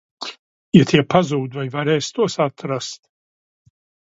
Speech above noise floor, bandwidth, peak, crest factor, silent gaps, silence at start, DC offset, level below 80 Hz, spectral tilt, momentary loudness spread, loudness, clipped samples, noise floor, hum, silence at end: over 72 dB; 8 kHz; 0 dBFS; 20 dB; 0.39-0.72 s; 0.2 s; under 0.1%; -54 dBFS; -6 dB/octave; 18 LU; -18 LUFS; under 0.1%; under -90 dBFS; none; 1.15 s